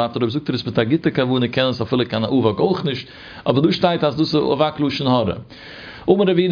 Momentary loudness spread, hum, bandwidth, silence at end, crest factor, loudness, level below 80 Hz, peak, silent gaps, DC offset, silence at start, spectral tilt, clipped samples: 11 LU; none; 5.2 kHz; 0 s; 18 dB; -19 LUFS; -52 dBFS; -2 dBFS; none; under 0.1%; 0 s; -7.5 dB/octave; under 0.1%